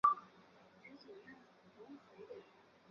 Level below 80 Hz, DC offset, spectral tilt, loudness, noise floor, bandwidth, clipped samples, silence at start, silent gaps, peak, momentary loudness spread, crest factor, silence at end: -84 dBFS; under 0.1%; -2.5 dB/octave; -45 LUFS; -65 dBFS; 7 kHz; under 0.1%; 0.05 s; none; -18 dBFS; 18 LU; 26 dB; 0.5 s